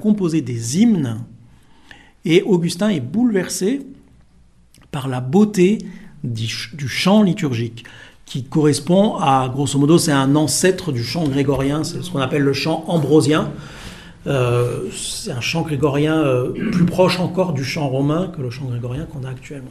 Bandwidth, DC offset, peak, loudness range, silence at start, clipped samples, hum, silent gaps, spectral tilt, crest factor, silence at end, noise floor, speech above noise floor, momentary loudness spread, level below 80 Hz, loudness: 14.5 kHz; under 0.1%; -2 dBFS; 4 LU; 0 s; under 0.1%; none; none; -5.5 dB/octave; 16 dB; 0 s; -50 dBFS; 32 dB; 14 LU; -46 dBFS; -18 LUFS